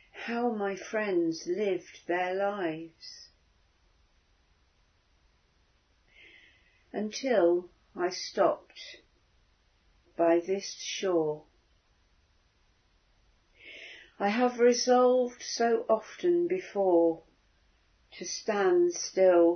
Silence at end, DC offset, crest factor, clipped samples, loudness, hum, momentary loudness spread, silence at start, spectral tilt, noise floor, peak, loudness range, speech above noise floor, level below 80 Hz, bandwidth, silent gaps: 0 s; under 0.1%; 18 dB; under 0.1%; -29 LUFS; none; 21 LU; 0.15 s; -4 dB/octave; -68 dBFS; -12 dBFS; 10 LU; 41 dB; -72 dBFS; 6.6 kHz; none